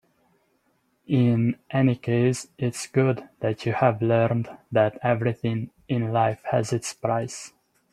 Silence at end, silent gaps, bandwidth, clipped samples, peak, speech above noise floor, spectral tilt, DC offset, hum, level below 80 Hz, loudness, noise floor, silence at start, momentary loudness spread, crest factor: 0.45 s; none; 12.5 kHz; under 0.1%; -4 dBFS; 45 dB; -6.5 dB/octave; under 0.1%; none; -62 dBFS; -24 LUFS; -69 dBFS; 1.1 s; 8 LU; 20 dB